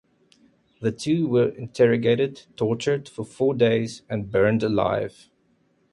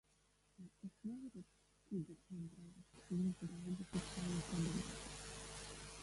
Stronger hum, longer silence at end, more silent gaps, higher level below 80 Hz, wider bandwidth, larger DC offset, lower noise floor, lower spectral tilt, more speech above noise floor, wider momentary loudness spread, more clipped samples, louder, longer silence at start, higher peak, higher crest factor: second, none vs 50 Hz at -65 dBFS; first, 0.8 s vs 0 s; neither; first, -56 dBFS vs -64 dBFS; about the same, 11.5 kHz vs 11.5 kHz; neither; second, -65 dBFS vs -76 dBFS; first, -6.5 dB/octave vs -5 dB/octave; first, 43 dB vs 31 dB; second, 9 LU vs 18 LU; neither; first, -23 LUFS vs -47 LUFS; first, 0.8 s vs 0.6 s; first, -6 dBFS vs -30 dBFS; about the same, 16 dB vs 18 dB